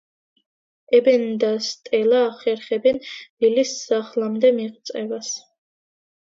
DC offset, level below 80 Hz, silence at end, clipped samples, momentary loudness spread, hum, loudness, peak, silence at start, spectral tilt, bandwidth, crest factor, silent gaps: under 0.1%; -70 dBFS; 0.9 s; under 0.1%; 12 LU; none; -21 LUFS; -4 dBFS; 0.9 s; -3.5 dB/octave; 7.8 kHz; 18 dB; 3.30-3.37 s